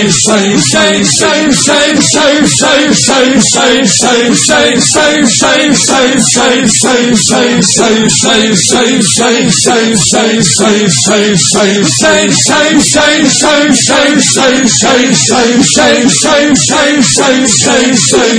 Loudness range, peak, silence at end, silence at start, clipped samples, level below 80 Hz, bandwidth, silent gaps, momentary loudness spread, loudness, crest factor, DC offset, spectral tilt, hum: 1 LU; 0 dBFS; 0 s; 0 s; 2%; -38 dBFS; 11 kHz; none; 1 LU; -6 LUFS; 6 dB; under 0.1%; -2.5 dB/octave; none